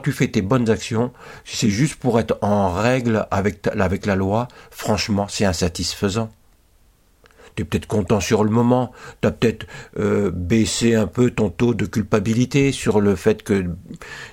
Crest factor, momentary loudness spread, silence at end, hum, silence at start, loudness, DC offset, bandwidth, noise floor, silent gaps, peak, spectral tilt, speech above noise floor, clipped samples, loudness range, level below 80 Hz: 16 dB; 11 LU; 0 s; none; 0 s; -20 LUFS; under 0.1%; 16.5 kHz; -55 dBFS; none; -2 dBFS; -5.5 dB/octave; 36 dB; under 0.1%; 4 LU; -42 dBFS